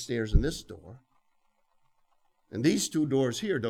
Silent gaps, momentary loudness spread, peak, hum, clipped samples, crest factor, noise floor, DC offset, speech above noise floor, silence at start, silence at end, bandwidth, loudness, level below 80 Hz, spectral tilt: none; 16 LU; -8 dBFS; none; under 0.1%; 22 dB; -70 dBFS; under 0.1%; 42 dB; 0 s; 0 s; 16 kHz; -28 LUFS; -38 dBFS; -5 dB/octave